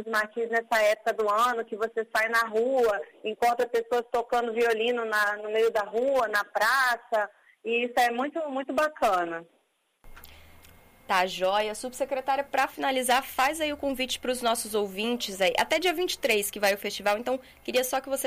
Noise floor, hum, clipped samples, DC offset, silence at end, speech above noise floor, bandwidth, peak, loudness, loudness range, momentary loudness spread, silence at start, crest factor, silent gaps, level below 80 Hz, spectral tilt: -71 dBFS; none; under 0.1%; under 0.1%; 0 s; 44 dB; 15.5 kHz; -10 dBFS; -27 LUFS; 4 LU; 6 LU; 0 s; 16 dB; none; -60 dBFS; -2 dB/octave